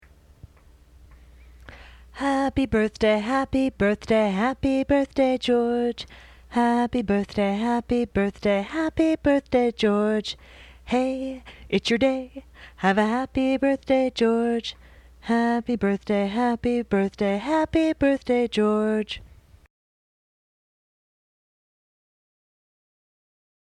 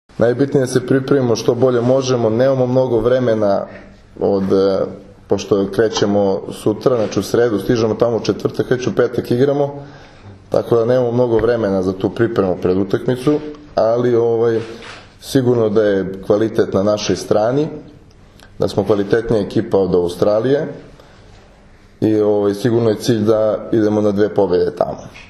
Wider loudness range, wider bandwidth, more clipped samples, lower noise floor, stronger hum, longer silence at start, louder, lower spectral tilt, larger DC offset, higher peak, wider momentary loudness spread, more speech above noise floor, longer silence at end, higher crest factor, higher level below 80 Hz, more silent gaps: about the same, 3 LU vs 2 LU; second, 11.5 kHz vs 13 kHz; neither; first, -53 dBFS vs -45 dBFS; neither; first, 1.7 s vs 0.2 s; second, -23 LUFS vs -16 LUFS; about the same, -6 dB/octave vs -6.5 dB/octave; neither; second, -8 dBFS vs 0 dBFS; about the same, 8 LU vs 7 LU; about the same, 30 dB vs 29 dB; first, 4.45 s vs 0.05 s; about the same, 16 dB vs 16 dB; about the same, -48 dBFS vs -46 dBFS; neither